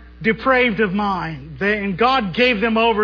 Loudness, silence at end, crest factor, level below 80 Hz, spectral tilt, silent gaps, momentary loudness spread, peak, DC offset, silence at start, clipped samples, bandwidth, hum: -18 LUFS; 0 s; 16 dB; -42 dBFS; -7 dB/octave; none; 7 LU; -2 dBFS; under 0.1%; 0 s; under 0.1%; 5.4 kHz; none